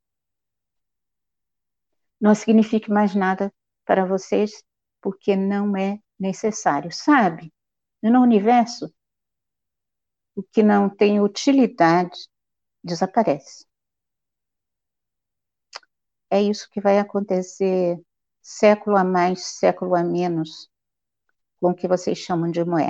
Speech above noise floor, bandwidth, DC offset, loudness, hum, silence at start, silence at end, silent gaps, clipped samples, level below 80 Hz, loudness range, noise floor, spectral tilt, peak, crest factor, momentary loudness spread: 68 dB; 8 kHz; under 0.1%; -20 LUFS; none; 2.2 s; 0 s; none; under 0.1%; -70 dBFS; 6 LU; -88 dBFS; -6 dB/octave; -4 dBFS; 18 dB; 13 LU